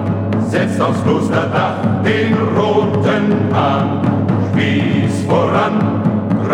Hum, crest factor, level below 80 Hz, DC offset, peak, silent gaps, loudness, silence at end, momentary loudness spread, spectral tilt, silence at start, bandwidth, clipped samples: none; 14 dB; -50 dBFS; under 0.1%; -2 dBFS; none; -15 LUFS; 0 s; 2 LU; -7.5 dB/octave; 0 s; 11 kHz; under 0.1%